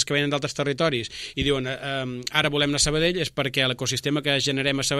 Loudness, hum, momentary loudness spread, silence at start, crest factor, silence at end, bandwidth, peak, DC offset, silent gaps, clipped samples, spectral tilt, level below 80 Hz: -23 LUFS; none; 8 LU; 0 s; 20 dB; 0 s; 15 kHz; -4 dBFS; under 0.1%; none; under 0.1%; -3.5 dB/octave; -46 dBFS